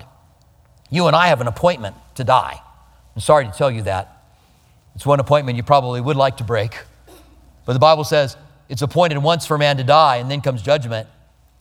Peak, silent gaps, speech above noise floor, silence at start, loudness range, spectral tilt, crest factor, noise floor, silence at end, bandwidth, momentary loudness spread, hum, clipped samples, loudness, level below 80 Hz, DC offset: 0 dBFS; none; 36 dB; 0.9 s; 4 LU; -5.5 dB/octave; 18 dB; -53 dBFS; 0.55 s; 16 kHz; 14 LU; none; under 0.1%; -17 LUFS; -48 dBFS; under 0.1%